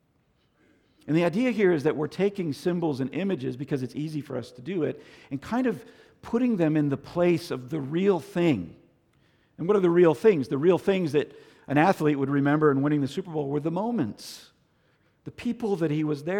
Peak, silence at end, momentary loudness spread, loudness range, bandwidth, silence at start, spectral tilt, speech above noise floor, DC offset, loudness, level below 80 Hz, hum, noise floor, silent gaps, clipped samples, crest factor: -8 dBFS; 0 s; 13 LU; 7 LU; 16 kHz; 1.05 s; -7.5 dB/octave; 42 dB; under 0.1%; -26 LUFS; -64 dBFS; none; -68 dBFS; none; under 0.1%; 18 dB